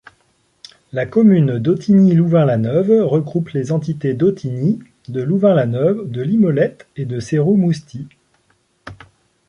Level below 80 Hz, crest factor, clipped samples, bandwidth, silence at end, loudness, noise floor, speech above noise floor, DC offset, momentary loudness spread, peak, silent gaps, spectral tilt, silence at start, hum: -54 dBFS; 14 dB; under 0.1%; 9.6 kHz; 0.55 s; -16 LUFS; -61 dBFS; 46 dB; under 0.1%; 13 LU; -2 dBFS; none; -9 dB/octave; 0.95 s; none